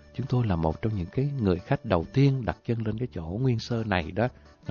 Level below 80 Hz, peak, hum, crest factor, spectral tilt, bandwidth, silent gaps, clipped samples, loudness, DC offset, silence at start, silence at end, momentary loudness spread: -44 dBFS; -8 dBFS; none; 18 dB; -8 dB/octave; 7 kHz; none; under 0.1%; -28 LUFS; under 0.1%; 0.15 s; 0 s; 7 LU